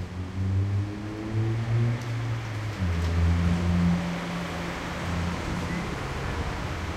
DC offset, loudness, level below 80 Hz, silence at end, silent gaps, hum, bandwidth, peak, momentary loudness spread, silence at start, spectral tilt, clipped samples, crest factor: under 0.1%; -29 LUFS; -40 dBFS; 0 s; none; none; 13.5 kHz; -14 dBFS; 8 LU; 0 s; -6.5 dB/octave; under 0.1%; 14 dB